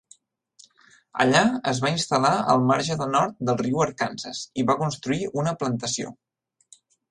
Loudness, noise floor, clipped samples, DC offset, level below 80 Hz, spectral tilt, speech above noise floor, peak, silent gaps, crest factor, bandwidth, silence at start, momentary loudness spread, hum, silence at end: -23 LUFS; -58 dBFS; under 0.1%; under 0.1%; -60 dBFS; -4.5 dB/octave; 35 dB; -4 dBFS; none; 20 dB; 11 kHz; 1.15 s; 9 LU; none; 0.95 s